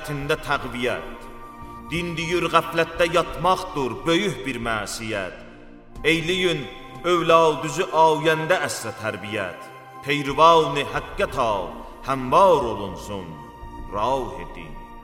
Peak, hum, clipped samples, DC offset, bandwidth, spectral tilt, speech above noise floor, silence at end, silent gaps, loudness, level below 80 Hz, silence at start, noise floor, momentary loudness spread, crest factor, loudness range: -2 dBFS; none; under 0.1%; under 0.1%; 16.5 kHz; -4.5 dB/octave; 21 dB; 0 s; none; -22 LUFS; -42 dBFS; 0 s; -43 dBFS; 21 LU; 22 dB; 4 LU